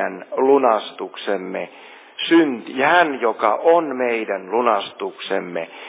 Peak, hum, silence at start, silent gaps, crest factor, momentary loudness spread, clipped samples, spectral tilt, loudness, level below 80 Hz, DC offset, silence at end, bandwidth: -2 dBFS; none; 0 s; none; 18 dB; 13 LU; under 0.1%; -8.5 dB/octave; -19 LUFS; -82 dBFS; under 0.1%; 0 s; 4 kHz